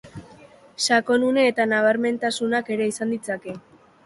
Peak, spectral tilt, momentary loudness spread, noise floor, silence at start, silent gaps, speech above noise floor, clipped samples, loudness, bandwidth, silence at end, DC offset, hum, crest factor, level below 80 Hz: -6 dBFS; -3.5 dB/octave; 13 LU; -49 dBFS; 0.05 s; none; 27 dB; under 0.1%; -22 LUFS; 11.5 kHz; 0.45 s; under 0.1%; none; 16 dB; -64 dBFS